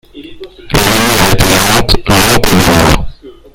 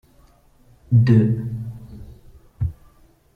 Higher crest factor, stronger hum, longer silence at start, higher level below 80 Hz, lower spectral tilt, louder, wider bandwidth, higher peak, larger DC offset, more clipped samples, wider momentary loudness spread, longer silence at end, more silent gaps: second, 10 dB vs 18 dB; neither; second, 0.15 s vs 0.9 s; first, -20 dBFS vs -42 dBFS; second, -3.5 dB/octave vs -10 dB/octave; first, -8 LUFS vs -20 LUFS; first, over 20 kHz vs 5 kHz; first, 0 dBFS vs -4 dBFS; neither; first, 3% vs under 0.1%; second, 6 LU vs 25 LU; second, 0.25 s vs 0.65 s; neither